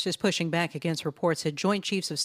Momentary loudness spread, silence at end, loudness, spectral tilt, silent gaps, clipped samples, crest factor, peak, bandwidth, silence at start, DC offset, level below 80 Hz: 3 LU; 0 s; -28 LUFS; -4.5 dB/octave; none; under 0.1%; 18 dB; -10 dBFS; 15.5 kHz; 0 s; under 0.1%; -68 dBFS